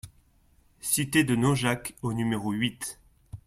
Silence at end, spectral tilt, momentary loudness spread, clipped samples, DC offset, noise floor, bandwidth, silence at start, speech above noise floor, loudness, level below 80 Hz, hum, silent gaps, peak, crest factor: 0.1 s; -4.5 dB/octave; 13 LU; under 0.1%; under 0.1%; -62 dBFS; 16.5 kHz; 0.05 s; 36 dB; -27 LUFS; -56 dBFS; none; none; -10 dBFS; 20 dB